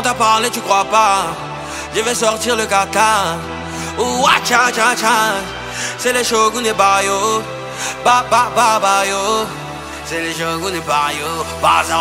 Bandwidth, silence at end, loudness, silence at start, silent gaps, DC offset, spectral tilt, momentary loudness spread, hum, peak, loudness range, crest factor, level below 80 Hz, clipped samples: 16 kHz; 0 s; -15 LUFS; 0 s; none; under 0.1%; -2 dB/octave; 11 LU; none; 0 dBFS; 2 LU; 16 dB; -44 dBFS; under 0.1%